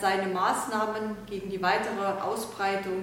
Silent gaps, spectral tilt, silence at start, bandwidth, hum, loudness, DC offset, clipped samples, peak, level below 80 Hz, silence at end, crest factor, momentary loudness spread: none; -4 dB/octave; 0 s; 16.5 kHz; none; -29 LUFS; under 0.1%; under 0.1%; -12 dBFS; -60 dBFS; 0 s; 18 dB; 8 LU